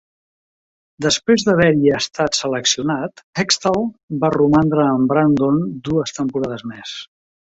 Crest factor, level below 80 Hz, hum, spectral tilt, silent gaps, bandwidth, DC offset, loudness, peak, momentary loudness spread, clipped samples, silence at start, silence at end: 16 dB; -50 dBFS; none; -4.5 dB/octave; 3.23-3.33 s, 4.03-4.08 s; 8 kHz; under 0.1%; -17 LUFS; -2 dBFS; 11 LU; under 0.1%; 1 s; 0.55 s